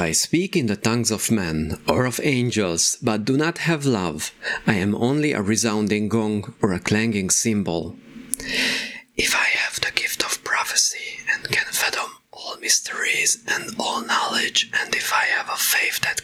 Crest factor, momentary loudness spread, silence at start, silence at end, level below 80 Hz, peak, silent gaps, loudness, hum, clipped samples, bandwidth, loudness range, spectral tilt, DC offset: 22 dB; 7 LU; 0 s; 0 s; -50 dBFS; 0 dBFS; none; -21 LUFS; none; under 0.1%; 20 kHz; 2 LU; -3 dB/octave; under 0.1%